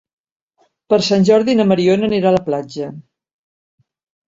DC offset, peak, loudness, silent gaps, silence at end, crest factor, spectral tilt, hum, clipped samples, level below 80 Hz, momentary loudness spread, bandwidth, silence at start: under 0.1%; 0 dBFS; -15 LUFS; none; 1.3 s; 16 dB; -6 dB/octave; none; under 0.1%; -56 dBFS; 14 LU; 7.8 kHz; 0.9 s